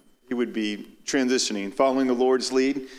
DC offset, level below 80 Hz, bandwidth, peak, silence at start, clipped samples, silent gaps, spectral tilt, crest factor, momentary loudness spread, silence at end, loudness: under 0.1%; -64 dBFS; 13 kHz; -8 dBFS; 0.3 s; under 0.1%; none; -3 dB/octave; 16 dB; 8 LU; 0 s; -24 LUFS